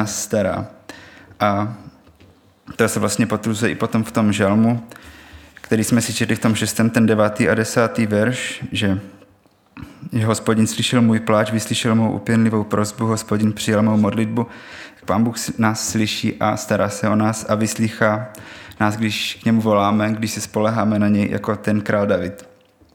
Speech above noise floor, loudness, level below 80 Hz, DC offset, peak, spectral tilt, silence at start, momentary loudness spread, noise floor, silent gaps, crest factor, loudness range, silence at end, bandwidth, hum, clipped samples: 36 dB; -19 LUFS; -56 dBFS; under 0.1%; -2 dBFS; -5 dB/octave; 0 s; 9 LU; -55 dBFS; none; 18 dB; 3 LU; 0.5 s; 17.5 kHz; none; under 0.1%